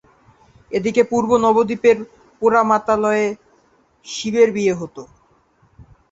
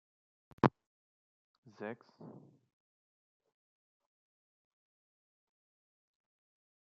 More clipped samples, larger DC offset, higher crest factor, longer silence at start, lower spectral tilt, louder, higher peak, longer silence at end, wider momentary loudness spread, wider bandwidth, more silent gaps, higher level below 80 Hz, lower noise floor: neither; neither; second, 18 dB vs 36 dB; about the same, 0.7 s vs 0.65 s; second, -5 dB/octave vs -6.5 dB/octave; first, -17 LUFS vs -36 LUFS; first, -2 dBFS vs -8 dBFS; second, 0.3 s vs 4.5 s; second, 15 LU vs 22 LU; first, 8 kHz vs 7.2 kHz; second, none vs 0.87-1.63 s; first, -54 dBFS vs -72 dBFS; second, -57 dBFS vs under -90 dBFS